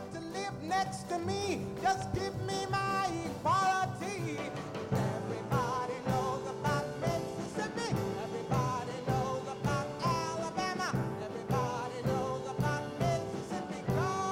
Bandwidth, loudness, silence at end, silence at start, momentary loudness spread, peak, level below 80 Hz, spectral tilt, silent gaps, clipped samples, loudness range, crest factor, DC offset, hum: 16.5 kHz; -34 LUFS; 0 s; 0 s; 6 LU; -18 dBFS; -56 dBFS; -5.5 dB/octave; none; under 0.1%; 2 LU; 16 dB; under 0.1%; none